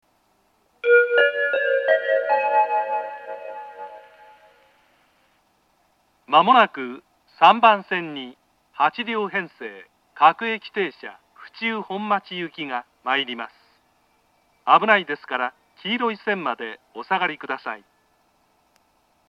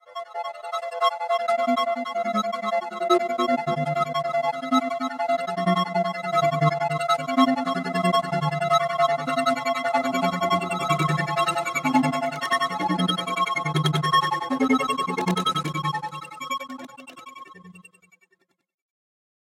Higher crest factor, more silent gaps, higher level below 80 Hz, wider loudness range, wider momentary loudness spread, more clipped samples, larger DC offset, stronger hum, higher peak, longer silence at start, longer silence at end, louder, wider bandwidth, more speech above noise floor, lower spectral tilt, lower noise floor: about the same, 22 dB vs 18 dB; neither; second, -78 dBFS vs -70 dBFS; first, 8 LU vs 5 LU; first, 20 LU vs 10 LU; neither; neither; neither; first, 0 dBFS vs -6 dBFS; first, 0.85 s vs 0.1 s; about the same, 1.55 s vs 1.65 s; first, -21 LUFS vs -24 LUFS; second, 7.2 kHz vs 16 kHz; about the same, 43 dB vs 43 dB; about the same, -5.5 dB/octave vs -5 dB/octave; second, -64 dBFS vs -69 dBFS